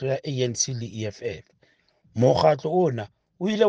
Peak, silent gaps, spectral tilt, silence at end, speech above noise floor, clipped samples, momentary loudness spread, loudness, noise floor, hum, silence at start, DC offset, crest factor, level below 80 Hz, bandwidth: -4 dBFS; none; -5 dB/octave; 0 s; 41 dB; under 0.1%; 15 LU; -24 LUFS; -64 dBFS; none; 0 s; under 0.1%; 20 dB; -58 dBFS; 10.5 kHz